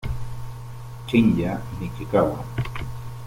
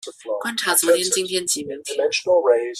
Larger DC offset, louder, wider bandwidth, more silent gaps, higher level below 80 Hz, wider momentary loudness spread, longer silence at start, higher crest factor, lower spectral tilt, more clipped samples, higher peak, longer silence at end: neither; second, -24 LUFS vs -20 LUFS; about the same, 16.5 kHz vs 15 kHz; neither; first, -40 dBFS vs -68 dBFS; first, 18 LU vs 10 LU; about the same, 0 s vs 0.05 s; about the same, 18 dB vs 18 dB; first, -7.5 dB/octave vs -1 dB/octave; neither; second, -6 dBFS vs -2 dBFS; about the same, 0 s vs 0 s